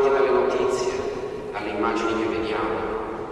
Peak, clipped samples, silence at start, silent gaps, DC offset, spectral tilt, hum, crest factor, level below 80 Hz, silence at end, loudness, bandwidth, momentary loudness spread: -10 dBFS; under 0.1%; 0 s; none; under 0.1%; -5 dB/octave; none; 14 dB; -48 dBFS; 0 s; -24 LUFS; 11.5 kHz; 10 LU